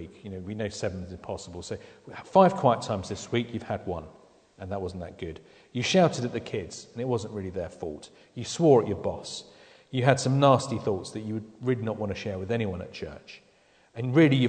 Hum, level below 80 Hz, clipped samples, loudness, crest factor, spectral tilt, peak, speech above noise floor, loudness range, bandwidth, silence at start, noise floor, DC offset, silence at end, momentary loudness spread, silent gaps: none; -58 dBFS; under 0.1%; -28 LUFS; 22 dB; -6 dB/octave; -4 dBFS; 34 dB; 6 LU; 9.4 kHz; 0 s; -61 dBFS; under 0.1%; 0 s; 19 LU; none